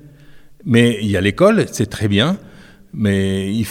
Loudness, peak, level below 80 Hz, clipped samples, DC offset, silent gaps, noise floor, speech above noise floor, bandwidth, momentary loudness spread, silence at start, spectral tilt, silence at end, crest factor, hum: -16 LUFS; 0 dBFS; -46 dBFS; under 0.1%; under 0.1%; none; -41 dBFS; 26 dB; 16 kHz; 9 LU; 0.3 s; -6 dB/octave; 0 s; 16 dB; none